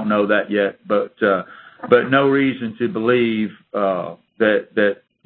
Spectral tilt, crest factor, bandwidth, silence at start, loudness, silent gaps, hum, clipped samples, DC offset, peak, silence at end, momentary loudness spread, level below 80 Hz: -9.5 dB/octave; 18 dB; 4.4 kHz; 0 s; -19 LUFS; none; none; under 0.1%; under 0.1%; 0 dBFS; 0.3 s; 9 LU; -62 dBFS